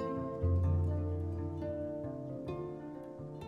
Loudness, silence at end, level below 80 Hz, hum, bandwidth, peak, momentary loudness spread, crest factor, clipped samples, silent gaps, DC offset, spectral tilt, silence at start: -37 LUFS; 0 s; -48 dBFS; none; 3.8 kHz; -22 dBFS; 13 LU; 14 dB; under 0.1%; none; under 0.1%; -10.5 dB/octave; 0 s